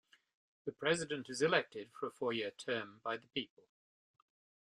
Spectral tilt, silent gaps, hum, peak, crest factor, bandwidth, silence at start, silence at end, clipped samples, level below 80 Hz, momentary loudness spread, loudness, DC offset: -3.5 dB/octave; none; none; -14 dBFS; 26 dB; 11.5 kHz; 0.65 s; 1.25 s; under 0.1%; -80 dBFS; 15 LU; -39 LUFS; under 0.1%